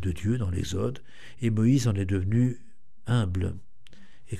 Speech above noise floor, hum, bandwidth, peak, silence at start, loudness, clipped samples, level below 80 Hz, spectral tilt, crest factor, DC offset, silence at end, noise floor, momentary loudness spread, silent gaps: 28 dB; none; 13 kHz; -12 dBFS; 0 s; -27 LUFS; under 0.1%; -48 dBFS; -7 dB/octave; 14 dB; 1%; 0 s; -55 dBFS; 17 LU; none